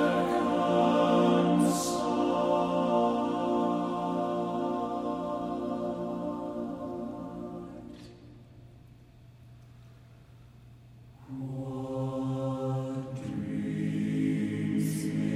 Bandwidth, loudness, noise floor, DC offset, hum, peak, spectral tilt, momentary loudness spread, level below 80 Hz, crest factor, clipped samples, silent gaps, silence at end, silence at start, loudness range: 15.5 kHz; -30 LUFS; -54 dBFS; under 0.1%; none; -14 dBFS; -6.5 dB/octave; 14 LU; -60 dBFS; 18 dB; under 0.1%; none; 0 s; 0 s; 19 LU